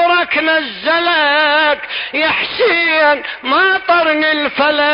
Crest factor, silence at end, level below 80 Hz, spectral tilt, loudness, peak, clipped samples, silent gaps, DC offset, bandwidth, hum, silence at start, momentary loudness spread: 12 dB; 0 s; -54 dBFS; -7.5 dB/octave; -13 LUFS; -2 dBFS; under 0.1%; none; under 0.1%; 5.4 kHz; none; 0 s; 5 LU